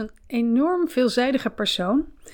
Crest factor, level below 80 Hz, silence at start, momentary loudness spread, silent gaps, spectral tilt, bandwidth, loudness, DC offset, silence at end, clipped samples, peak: 14 dB; -50 dBFS; 0 s; 5 LU; none; -4.5 dB/octave; 19 kHz; -22 LUFS; under 0.1%; 0 s; under 0.1%; -8 dBFS